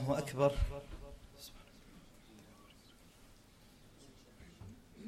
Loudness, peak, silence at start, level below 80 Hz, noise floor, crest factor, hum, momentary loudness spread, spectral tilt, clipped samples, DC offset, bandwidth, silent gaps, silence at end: -37 LUFS; -18 dBFS; 0 s; -50 dBFS; -62 dBFS; 24 dB; none; 28 LU; -6.5 dB/octave; under 0.1%; under 0.1%; 16 kHz; none; 0 s